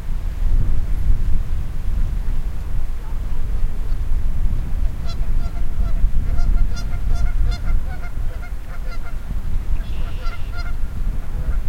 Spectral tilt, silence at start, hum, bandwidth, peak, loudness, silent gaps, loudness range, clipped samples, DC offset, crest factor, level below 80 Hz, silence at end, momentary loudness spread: -6.5 dB/octave; 0 s; none; 6 kHz; -2 dBFS; -27 LUFS; none; 4 LU; under 0.1%; under 0.1%; 14 dB; -18 dBFS; 0 s; 7 LU